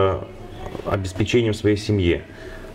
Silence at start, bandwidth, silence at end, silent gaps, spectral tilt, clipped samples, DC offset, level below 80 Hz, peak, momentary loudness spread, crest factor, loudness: 0 s; 13.5 kHz; 0 s; none; -6.5 dB/octave; under 0.1%; under 0.1%; -40 dBFS; -6 dBFS; 17 LU; 16 dB; -22 LUFS